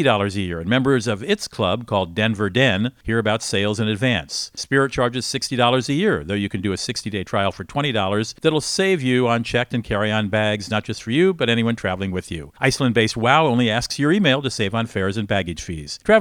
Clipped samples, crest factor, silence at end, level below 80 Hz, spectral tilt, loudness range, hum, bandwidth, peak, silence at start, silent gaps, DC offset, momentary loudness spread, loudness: under 0.1%; 20 dB; 0 s; -46 dBFS; -5 dB/octave; 2 LU; none; 17 kHz; 0 dBFS; 0 s; none; under 0.1%; 7 LU; -20 LUFS